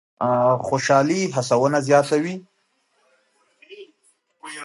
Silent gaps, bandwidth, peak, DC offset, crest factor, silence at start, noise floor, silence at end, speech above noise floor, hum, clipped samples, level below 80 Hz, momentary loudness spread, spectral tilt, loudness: none; 11.5 kHz; -2 dBFS; under 0.1%; 20 dB; 0.2 s; -67 dBFS; 0 s; 48 dB; none; under 0.1%; -66 dBFS; 15 LU; -5 dB/octave; -19 LUFS